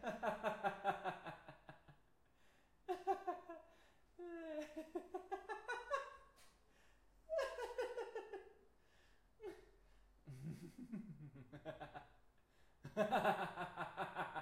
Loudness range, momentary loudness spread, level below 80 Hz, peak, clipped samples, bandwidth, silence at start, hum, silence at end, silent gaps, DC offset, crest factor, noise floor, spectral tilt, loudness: 11 LU; 17 LU; -74 dBFS; -24 dBFS; under 0.1%; 16 kHz; 0 s; none; 0 s; none; under 0.1%; 24 dB; -76 dBFS; -5.5 dB/octave; -46 LUFS